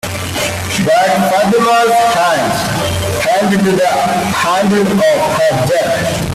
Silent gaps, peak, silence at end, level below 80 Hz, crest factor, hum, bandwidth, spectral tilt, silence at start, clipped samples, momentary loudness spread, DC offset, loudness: none; -2 dBFS; 0 s; -40 dBFS; 10 dB; none; 16 kHz; -4.5 dB/octave; 0.05 s; under 0.1%; 5 LU; under 0.1%; -12 LUFS